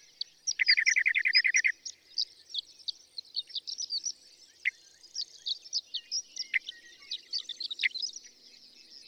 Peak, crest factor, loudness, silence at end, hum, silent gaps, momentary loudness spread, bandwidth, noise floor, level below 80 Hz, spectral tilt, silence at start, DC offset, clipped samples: -12 dBFS; 22 dB; -30 LUFS; 0.1 s; none; none; 17 LU; 15 kHz; -58 dBFS; -84 dBFS; 5.5 dB/octave; 0.45 s; under 0.1%; under 0.1%